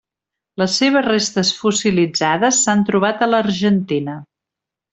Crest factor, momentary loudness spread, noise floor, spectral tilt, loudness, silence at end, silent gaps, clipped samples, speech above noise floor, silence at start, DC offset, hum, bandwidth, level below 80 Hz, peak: 16 dB; 8 LU; -85 dBFS; -3.5 dB/octave; -16 LUFS; 0.7 s; none; under 0.1%; 69 dB; 0.6 s; under 0.1%; none; 8.2 kHz; -56 dBFS; -2 dBFS